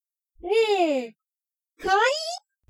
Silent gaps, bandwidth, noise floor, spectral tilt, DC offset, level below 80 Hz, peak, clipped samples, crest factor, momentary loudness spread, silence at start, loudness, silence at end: none; 12.5 kHz; under -90 dBFS; -2 dB/octave; under 0.1%; -60 dBFS; -10 dBFS; under 0.1%; 16 dB; 14 LU; 0.45 s; -24 LUFS; 0.3 s